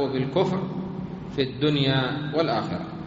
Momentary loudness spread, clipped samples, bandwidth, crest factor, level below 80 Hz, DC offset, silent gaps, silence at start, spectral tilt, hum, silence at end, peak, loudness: 10 LU; under 0.1%; 7.6 kHz; 16 dB; -54 dBFS; under 0.1%; none; 0 s; -5 dB/octave; none; 0 s; -8 dBFS; -25 LUFS